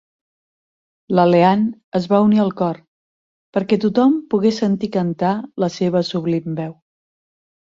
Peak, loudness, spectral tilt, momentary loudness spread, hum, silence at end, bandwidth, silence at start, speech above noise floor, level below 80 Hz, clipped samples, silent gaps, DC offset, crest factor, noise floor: -2 dBFS; -18 LUFS; -7.5 dB/octave; 10 LU; none; 1 s; 7.6 kHz; 1.1 s; over 73 dB; -60 dBFS; under 0.1%; 1.84-1.92 s, 2.88-3.53 s; under 0.1%; 16 dB; under -90 dBFS